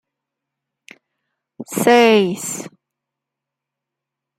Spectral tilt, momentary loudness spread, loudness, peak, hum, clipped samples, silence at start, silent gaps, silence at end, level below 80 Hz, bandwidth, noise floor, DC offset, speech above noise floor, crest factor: -4 dB/octave; 23 LU; -15 LUFS; -2 dBFS; none; under 0.1%; 1.6 s; none; 1.7 s; -68 dBFS; 16 kHz; -83 dBFS; under 0.1%; 69 dB; 20 dB